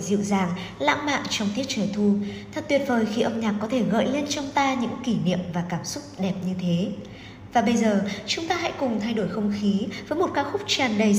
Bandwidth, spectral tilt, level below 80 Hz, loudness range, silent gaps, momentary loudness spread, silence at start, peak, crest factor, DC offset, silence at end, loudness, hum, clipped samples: 15.5 kHz; -5 dB/octave; -56 dBFS; 2 LU; none; 7 LU; 0 s; -6 dBFS; 18 dB; under 0.1%; 0 s; -25 LUFS; none; under 0.1%